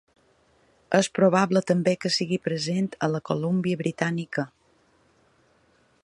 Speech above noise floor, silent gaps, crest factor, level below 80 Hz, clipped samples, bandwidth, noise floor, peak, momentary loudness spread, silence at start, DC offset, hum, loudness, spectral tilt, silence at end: 39 dB; none; 22 dB; -66 dBFS; under 0.1%; 11.5 kHz; -63 dBFS; -6 dBFS; 8 LU; 0.9 s; under 0.1%; none; -25 LUFS; -5.5 dB/octave; 1.55 s